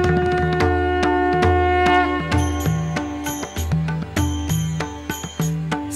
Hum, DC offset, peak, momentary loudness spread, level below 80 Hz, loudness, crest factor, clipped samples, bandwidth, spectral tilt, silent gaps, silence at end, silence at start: none; under 0.1%; -4 dBFS; 9 LU; -32 dBFS; -20 LUFS; 16 dB; under 0.1%; 13.5 kHz; -5.5 dB/octave; none; 0 s; 0 s